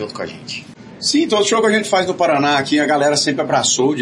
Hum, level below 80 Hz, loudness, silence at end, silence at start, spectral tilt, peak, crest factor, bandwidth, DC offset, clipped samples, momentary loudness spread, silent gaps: none; -62 dBFS; -15 LUFS; 0 s; 0 s; -3 dB/octave; -2 dBFS; 14 dB; 11.5 kHz; under 0.1%; under 0.1%; 13 LU; none